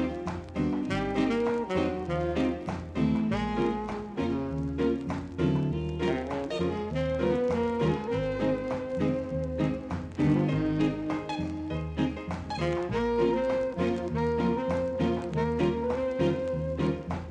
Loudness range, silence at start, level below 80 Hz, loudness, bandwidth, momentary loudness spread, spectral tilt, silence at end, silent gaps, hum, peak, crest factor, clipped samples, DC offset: 1 LU; 0 s; -44 dBFS; -29 LUFS; 9.6 kHz; 6 LU; -8 dB/octave; 0 s; none; none; -14 dBFS; 14 dB; under 0.1%; under 0.1%